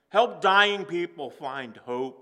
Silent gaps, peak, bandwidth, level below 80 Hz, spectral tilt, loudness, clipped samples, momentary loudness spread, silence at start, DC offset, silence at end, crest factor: none; -4 dBFS; 11.5 kHz; -86 dBFS; -3.5 dB/octave; -25 LUFS; under 0.1%; 15 LU; 0.15 s; under 0.1%; 0.1 s; 20 dB